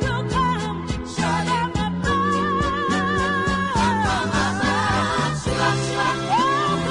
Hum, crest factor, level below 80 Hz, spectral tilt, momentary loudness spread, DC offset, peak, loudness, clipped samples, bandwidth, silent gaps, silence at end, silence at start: none; 12 dB; -38 dBFS; -5 dB/octave; 3 LU; under 0.1%; -8 dBFS; -21 LUFS; under 0.1%; 11 kHz; none; 0 s; 0 s